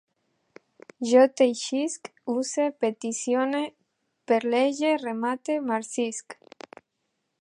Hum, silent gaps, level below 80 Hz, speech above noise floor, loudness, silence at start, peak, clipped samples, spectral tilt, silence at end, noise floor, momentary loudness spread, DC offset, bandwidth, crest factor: none; none; -82 dBFS; 53 dB; -25 LUFS; 1 s; -6 dBFS; under 0.1%; -3 dB/octave; 1.1 s; -78 dBFS; 15 LU; under 0.1%; 11.5 kHz; 20 dB